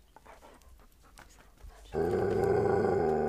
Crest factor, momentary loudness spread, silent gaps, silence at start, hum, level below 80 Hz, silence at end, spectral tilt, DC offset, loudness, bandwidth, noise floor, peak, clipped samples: 16 dB; 6 LU; none; 0.3 s; none; -52 dBFS; 0 s; -8 dB/octave; under 0.1%; -29 LUFS; 13.5 kHz; -57 dBFS; -16 dBFS; under 0.1%